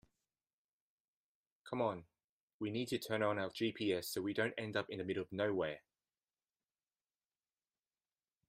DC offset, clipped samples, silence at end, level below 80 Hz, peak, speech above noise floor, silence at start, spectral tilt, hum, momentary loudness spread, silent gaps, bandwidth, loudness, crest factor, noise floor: under 0.1%; under 0.1%; 2.7 s; -80 dBFS; -22 dBFS; over 51 dB; 1.65 s; -5 dB/octave; none; 6 LU; 2.24-2.60 s; 15 kHz; -40 LUFS; 20 dB; under -90 dBFS